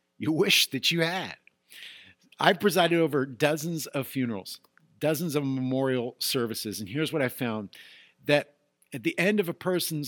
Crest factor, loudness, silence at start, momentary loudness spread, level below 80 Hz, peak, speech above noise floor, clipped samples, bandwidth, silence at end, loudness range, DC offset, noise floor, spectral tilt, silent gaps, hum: 24 dB; -27 LUFS; 0.2 s; 19 LU; -76 dBFS; -4 dBFS; 26 dB; under 0.1%; 19 kHz; 0 s; 4 LU; under 0.1%; -53 dBFS; -4 dB/octave; none; none